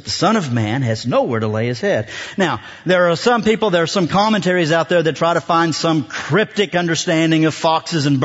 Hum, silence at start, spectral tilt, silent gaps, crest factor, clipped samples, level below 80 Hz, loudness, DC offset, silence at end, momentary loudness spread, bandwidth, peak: none; 0.05 s; -5 dB/octave; none; 14 dB; under 0.1%; -56 dBFS; -17 LUFS; under 0.1%; 0 s; 4 LU; 8 kHz; -2 dBFS